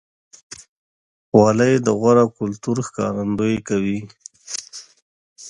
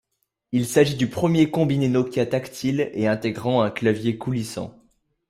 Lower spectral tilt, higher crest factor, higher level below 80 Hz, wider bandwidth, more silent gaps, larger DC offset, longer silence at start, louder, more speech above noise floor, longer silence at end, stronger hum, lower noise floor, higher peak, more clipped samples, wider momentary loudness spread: about the same, -6 dB/octave vs -6.5 dB/octave; about the same, 20 dB vs 18 dB; about the same, -54 dBFS vs -56 dBFS; second, 11.5 kHz vs 16 kHz; first, 0.68-1.32 s, 5.02-5.36 s vs none; neither; about the same, 0.5 s vs 0.5 s; first, -19 LUFS vs -22 LUFS; first, over 72 dB vs 54 dB; second, 0 s vs 0.6 s; neither; first, under -90 dBFS vs -75 dBFS; first, 0 dBFS vs -4 dBFS; neither; first, 24 LU vs 8 LU